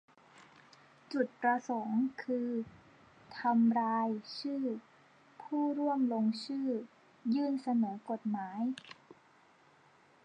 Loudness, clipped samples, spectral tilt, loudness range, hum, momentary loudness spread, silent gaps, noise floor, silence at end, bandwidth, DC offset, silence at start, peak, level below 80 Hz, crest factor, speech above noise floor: -34 LUFS; under 0.1%; -6.5 dB/octave; 3 LU; none; 13 LU; none; -65 dBFS; 1.3 s; 9 kHz; under 0.1%; 0.4 s; -18 dBFS; -82 dBFS; 16 dB; 31 dB